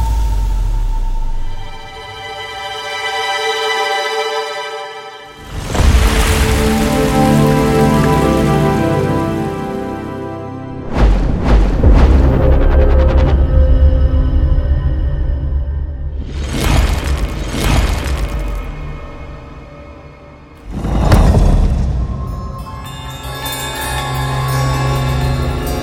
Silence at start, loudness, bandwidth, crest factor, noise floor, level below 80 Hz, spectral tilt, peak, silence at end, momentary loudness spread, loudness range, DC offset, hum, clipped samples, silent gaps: 0 s; -15 LUFS; 16.5 kHz; 14 dB; -37 dBFS; -16 dBFS; -6 dB/octave; 0 dBFS; 0 s; 16 LU; 7 LU; under 0.1%; none; under 0.1%; none